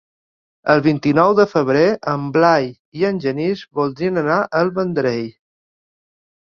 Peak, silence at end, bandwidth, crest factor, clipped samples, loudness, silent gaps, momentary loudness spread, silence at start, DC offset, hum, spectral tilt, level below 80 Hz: 0 dBFS; 1.2 s; 7 kHz; 18 dB; under 0.1%; -17 LUFS; 2.79-2.92 s; 8 LU; 0.65 s; under 0.1%; none; -7.5 dB/octave; -56 dBFS